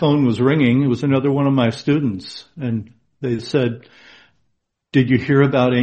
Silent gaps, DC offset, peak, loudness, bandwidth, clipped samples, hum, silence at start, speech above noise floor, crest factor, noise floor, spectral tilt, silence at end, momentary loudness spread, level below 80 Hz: none; under 0.1%; -2 dBFS; -18 LUFS; 8.6 kHz; under 0.1%; none; 0 s; 53 dB; 16 dB; -70 dBFS; -8 dB/octave; 0 s; 13 LU; -54 dBFS